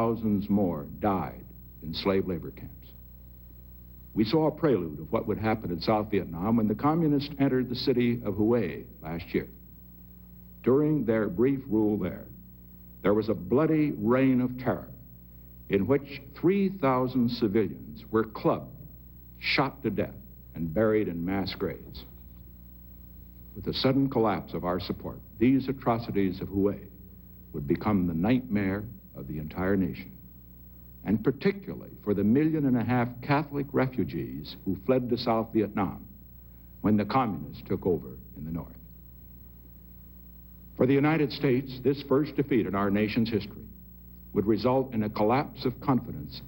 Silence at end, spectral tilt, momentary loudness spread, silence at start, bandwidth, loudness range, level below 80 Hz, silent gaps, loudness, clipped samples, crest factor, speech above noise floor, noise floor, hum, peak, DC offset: 0 s; -9.5 dB/octave; 23 LU; 0 s; 16 kHz; 4 LU; -50 dBFS; none; -28 LUFS; under 0.1%; 18 dB; 22 dB; -49 dBFS; 60 Hz at -50 dBFS; -10 dBFS; under 0.1%